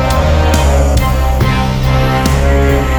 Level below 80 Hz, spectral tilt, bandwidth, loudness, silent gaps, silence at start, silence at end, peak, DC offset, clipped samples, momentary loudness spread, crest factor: -14 dBFS; -6 dB/octave; over 20 kHz; -12 LUFS; none; 0 s; 0 s; 0 dBFS; under 0.1%; under 0.1%; 2 LU; 10 dB